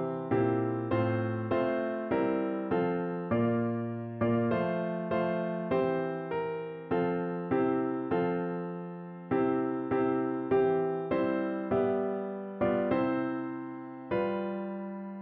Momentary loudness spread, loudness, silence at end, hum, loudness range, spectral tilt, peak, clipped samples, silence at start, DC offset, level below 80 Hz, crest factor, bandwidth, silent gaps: 8 LU; -31 LUFS; 0 s; none; 2 LU; -7 dB/octave; -16 dBFS; under 0.1%; 0 s; under 0.1%; -64 dBFS; 14 dB; 4.5 kHz; none